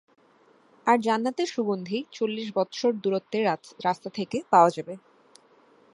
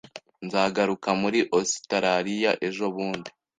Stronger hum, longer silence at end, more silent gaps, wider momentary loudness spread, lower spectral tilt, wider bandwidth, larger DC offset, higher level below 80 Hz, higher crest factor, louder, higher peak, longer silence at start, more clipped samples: neither; first, 0.95 s vs 0.3 s; neither; first, 11 LU vs 8 LU; first, -5.5 dB/octave vs -4 dB/octave; first, 11.5 kHz vs 9.6 kHz; neither; second, -76 dBFS vs -66 dBFS; about the same, 22 dB vs 20 dB; about the same, -26 LUFS vs -25 LUFS; about the same, -6 dBFS vs -6 dBFS; first, 0.85 s vs 0.15 s; neither